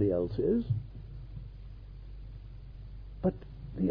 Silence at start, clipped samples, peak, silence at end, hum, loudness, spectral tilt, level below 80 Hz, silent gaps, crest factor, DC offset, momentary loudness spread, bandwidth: 0 s; under 0.1%; -16 dBFS; 0 s; none; -33 LUFS; -12 dB/octave; -46 dBFS; none; 18 dB; under 0.1%; 19 LU; 5.2 kHz